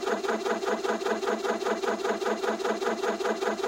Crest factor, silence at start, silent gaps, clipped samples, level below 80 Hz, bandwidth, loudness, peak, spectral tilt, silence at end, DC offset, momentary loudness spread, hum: 14 dB; 0 s; none; under 0.1%; -68 dBFS; 16 kHz; -29 LUFS; -14 dBFS; -3.5 dB/octave; 0 s; under 0.1%; 0 LU; none